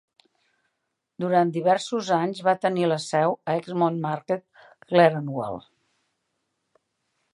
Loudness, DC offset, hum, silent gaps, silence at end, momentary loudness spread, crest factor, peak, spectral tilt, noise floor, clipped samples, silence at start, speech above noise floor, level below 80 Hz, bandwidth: -24 LUFS; under 0.1%; none; none; 1.75 s; 11 LU; 22 dB; -2 dBFS; -6 dB/octave; -79 dBFS; under 0.1%; 1.2 s; 56 dB; -72 dBFS; 11.5 kHz